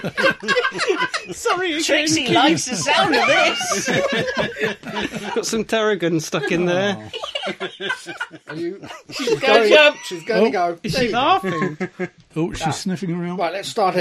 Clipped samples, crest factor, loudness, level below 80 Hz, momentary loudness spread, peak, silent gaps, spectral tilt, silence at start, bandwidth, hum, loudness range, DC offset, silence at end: under 0.1%; 20 dB; -19 LUFS; -52 dBFS; 13 LU; 0 dBFS; none; -3.5 dB/octave; 0 s; 14 kHz; none; 5 LU; under 0.1%; 0 s